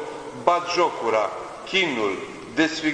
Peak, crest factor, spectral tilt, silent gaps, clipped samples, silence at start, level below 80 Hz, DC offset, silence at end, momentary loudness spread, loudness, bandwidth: -2 dBFS; 20 dB; -3.5 dB/octave; none; under 0.1%; 0 s; -60 dBFS; under 0.1%; 0 s; 10 LU; -23 LUFS; 10.5 kHz